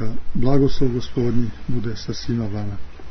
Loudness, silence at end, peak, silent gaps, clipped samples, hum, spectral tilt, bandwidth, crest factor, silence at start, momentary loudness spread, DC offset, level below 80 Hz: -23 LUFS; 0 s; -2 dBFS; none; under 0.1%; none; -7.5 dB/octave; 6.2 kHz; 14 dB; 0 s; 10 LU; under 0.1%; -32 dBFS